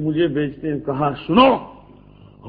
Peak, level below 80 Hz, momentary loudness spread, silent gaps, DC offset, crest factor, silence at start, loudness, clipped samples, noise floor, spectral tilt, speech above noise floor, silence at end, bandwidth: 0 dBFS; -48 dBFS; 10 LU; none; under 0.1%; 20 dB; 0 s; -19 LUFS; under 0.1%; -46 dBFS; -9.5 dB/octave; 27 dB; 0 s; 5.2 kHz